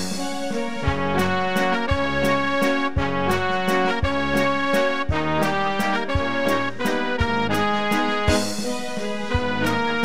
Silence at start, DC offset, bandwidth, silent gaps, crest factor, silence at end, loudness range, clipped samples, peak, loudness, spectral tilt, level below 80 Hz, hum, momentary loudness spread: 0 s; 3%; 16 kHz; none; 16 dB; 0 s; 1 LU; under 0.1%; -6 dBFS; -22 LUFS; -5 dB/octave; -38 dBFS; none; 5 LU